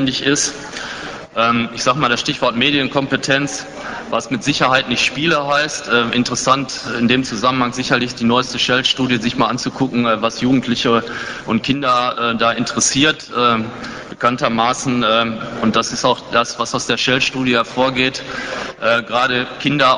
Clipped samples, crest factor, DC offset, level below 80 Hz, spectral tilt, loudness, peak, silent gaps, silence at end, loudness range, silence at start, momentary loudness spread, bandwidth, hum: under 0.1%; 16 dB; under 0.1%; -48 dBFS; -3.5 dB/octave; -16 LUFS; 0 dBFS; none; 0 s; 1 LU; 0 s; 8 LU; 10.5 kHz; none